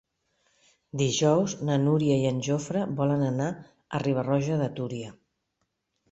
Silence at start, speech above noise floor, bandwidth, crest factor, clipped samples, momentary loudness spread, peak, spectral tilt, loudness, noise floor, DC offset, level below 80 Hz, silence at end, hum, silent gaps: 0.95 s; 53 dB; 8.2 kHz; 18 dB; under 0.1%; 11 LU; -8 dBFS; -6 dB/octave; -27 LUFS; -78 dBFS; under 0.1%; -62 dBFS; 1 s; none; none